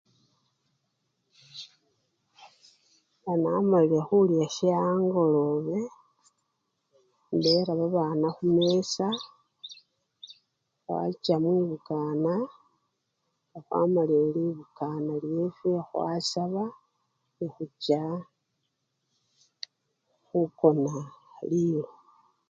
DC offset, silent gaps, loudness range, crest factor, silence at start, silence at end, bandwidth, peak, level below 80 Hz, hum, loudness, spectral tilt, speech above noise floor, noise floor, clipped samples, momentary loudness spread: under 0.1%; none; 8 LU; 22 dB; 1.55 s; 0.65 s; 7.8 kHz; -8 dBFS; -74 dBFS; none; -27 LUFS; -6.5 dB/octave; 53 dB; -79 dBFS; under 0.1%; 20 LU